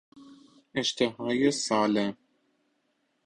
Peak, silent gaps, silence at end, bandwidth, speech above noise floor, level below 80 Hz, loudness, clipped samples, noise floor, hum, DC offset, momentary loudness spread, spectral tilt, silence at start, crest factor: -10 dBFS; none; 1.1 s; 10.5 kHz; 47 dB; -68 dBFS; -27 LUFS; under 0.1%; -74 dBFS; none; under 0.1%; 6 LU; -4 dB/octave; 0.15 s; 20 dB